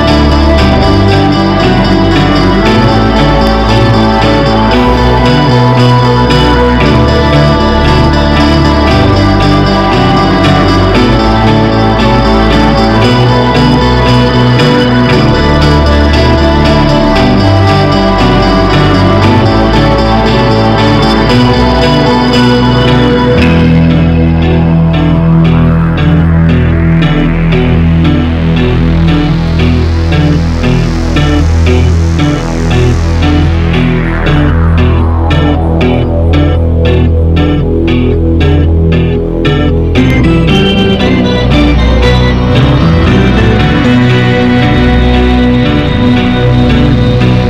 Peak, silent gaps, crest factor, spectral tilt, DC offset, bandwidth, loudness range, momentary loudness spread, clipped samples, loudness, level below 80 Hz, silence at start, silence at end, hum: 0 dBFS; none; 6 dB; -7 dB/octave; under 0.1%; 10.5 kHz; 2 LU; 3 LU; under 0.1%; -7 LUFS; -14 dBFS; 0 s; 0 s; none